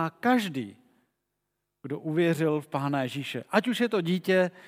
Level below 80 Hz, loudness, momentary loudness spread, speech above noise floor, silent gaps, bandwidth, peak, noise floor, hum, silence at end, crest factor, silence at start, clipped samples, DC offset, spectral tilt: -82 dBFS; -27 LUFS; 12 LU; 55 dB; none; 16 kHz; -6 dBFS; -82 dBFS; 50 Hz at -55 dBFS; 0 s; 22 dB; 0 s; under 0.1%; under 0.1%; -6 dB/octave